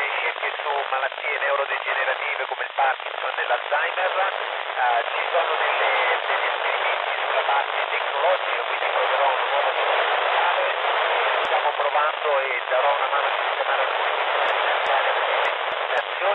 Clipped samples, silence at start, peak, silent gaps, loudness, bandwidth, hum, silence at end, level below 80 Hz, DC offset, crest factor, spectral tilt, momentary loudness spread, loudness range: under 0.1%; 0 s; -10 dBFS; none; -22 LUFS; 8.2 kHz; none; 0 s; -80 dBFS; under 0.1%; 14 dB; -1 dB/octave; 4 LU; 2 LU